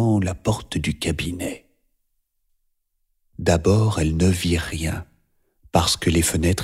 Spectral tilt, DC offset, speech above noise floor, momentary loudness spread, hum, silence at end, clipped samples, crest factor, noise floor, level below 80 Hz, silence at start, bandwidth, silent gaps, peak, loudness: -5 dB/octave; under 0.1%; 50 dB; 9 LU; none; 0 s; under 0.1%; 20 dB; -71 dBFS; -36 dBFS; 0 s; 16 kHz; none; -2 dBFS; -22 LUFS